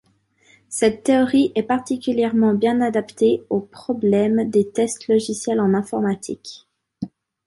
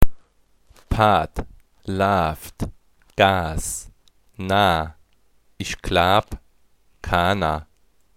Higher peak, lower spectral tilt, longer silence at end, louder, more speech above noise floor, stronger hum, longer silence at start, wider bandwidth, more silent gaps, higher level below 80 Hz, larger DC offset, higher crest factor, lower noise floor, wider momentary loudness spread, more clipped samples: second, -4 dBFS vs 0 dBFS; about the same, -5.5 dB/octave vs -4.5 dB/octave; second, 0.4 s vs 0.55 s; about the same, -20 LUFS vs -21 LUFS; about the same, 39 dB vs 42 dB; neither; first, 0.7 s vs 0 s; second, 11.5 kHz vs 16.5 kHz; neither; second, -60 dBFS vs -34 dBFS; neither; second, 16 dB vs 22 dB; about the same, -59 dBFS vs -62 dBFS; about the same, 14 LU vs 16 LU; neither